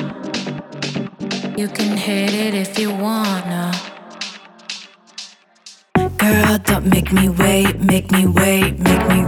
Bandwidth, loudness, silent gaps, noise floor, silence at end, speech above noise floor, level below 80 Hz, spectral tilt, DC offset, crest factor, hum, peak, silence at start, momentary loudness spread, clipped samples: 19 kHz; -17 LUFS; none; -45 dBFS; 0 s; 29 dB; -34 dBFS; -5 dB/octave; under 0.1%; 16 dB; none; 0 dBFS; 0 s; 16 LU; under 0.1%